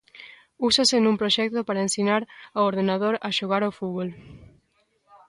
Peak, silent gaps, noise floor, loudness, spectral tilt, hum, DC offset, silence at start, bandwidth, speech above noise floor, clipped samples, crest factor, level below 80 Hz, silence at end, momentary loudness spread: -8 dBFS; none; -68 dBFS; -23 LUFS; -3.5 dB/octave; none; under 0.1%; 0.15 s; 11.5 kHz; 44 dB; under 0.1%; 18 dB; -62 dBFS; 0.85 s; 13 LU